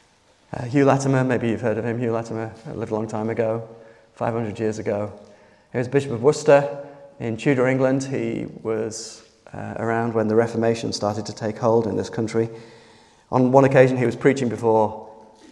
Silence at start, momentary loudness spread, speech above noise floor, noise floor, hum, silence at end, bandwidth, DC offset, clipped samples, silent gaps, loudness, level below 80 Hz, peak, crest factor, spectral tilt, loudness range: 0.5 s; 15 LU; 37 dB; -57 dBFS; none; 0.35 s; 11.5 kHz; under 0.1%; under 0.1%; none; -22 LUFS; -62 dBFS; 0 dBFS; 22 dB; -6.5 dB/octave; 6 LU